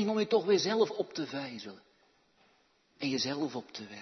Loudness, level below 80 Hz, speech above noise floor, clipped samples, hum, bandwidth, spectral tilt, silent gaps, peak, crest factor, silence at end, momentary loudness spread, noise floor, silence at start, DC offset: -32 LUFS; -80 dBFS; 37 dB; under 0.1%; none; 6.4 kHz; -4.5 dB/octave; none; -14 dBFS; 20 dB; 0 s; 16 LU; -69 dBFS; 0 s; under 0.1%